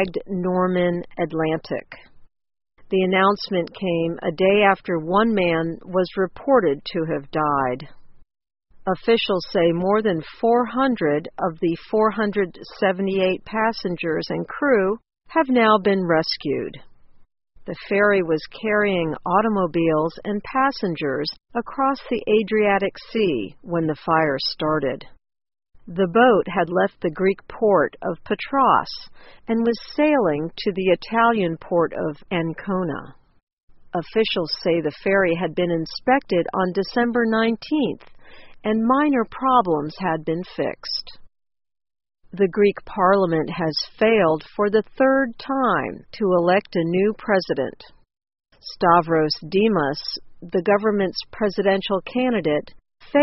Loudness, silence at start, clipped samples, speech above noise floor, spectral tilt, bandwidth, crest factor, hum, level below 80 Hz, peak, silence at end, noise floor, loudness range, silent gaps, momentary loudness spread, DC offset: -21 LUFS; 0 s; under 0.1%; 21 dB; -4 dB/octave; 6 kHz; 20 dB; none; -52 dBFS; -2 dBFS; 0 s; -42 dBFS; 3 LU; 33.43-33.47 s, 33.53-33.57 s, 33.63-33.68 s; 9 LU; under 0.1%